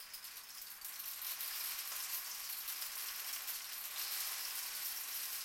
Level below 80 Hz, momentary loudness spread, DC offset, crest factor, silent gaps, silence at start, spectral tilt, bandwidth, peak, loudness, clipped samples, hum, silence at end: -80 dBFS; 8 LU; under 0.1%; 16 dB; none; 0 s; 3.5 dB/octave; 17 kHz; -28 dBFS; -41 LUFS; under 0.1%; none; 0 s